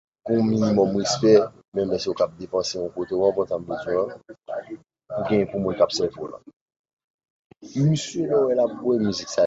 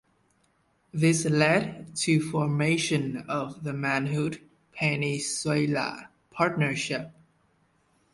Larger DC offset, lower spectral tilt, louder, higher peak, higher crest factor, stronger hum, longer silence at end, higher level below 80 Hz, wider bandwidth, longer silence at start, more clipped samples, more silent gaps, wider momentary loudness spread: neither; about the same, -6 dB/octave vs -5 dB/octave; first, -23 LUFS vs -27 LUFS; first, -4 dBFS vs -8 dBFS; about the same, 20 dB vs 20 dB; neither; second, 0 s vs 1 s; first, -56 dBFS vs -64 dBFS; second, 8 kHz vs 11.5 kHz; second, 0.25 s vs 0.95 s; neither; first, 1.68-1.72 s, 6.56-6.66 s, 6.76-6.84 s, 6.93-6.97 s, 7.04-7.19 s, 7.30-7.50 s vs none; first, 14 LU vs 11 LU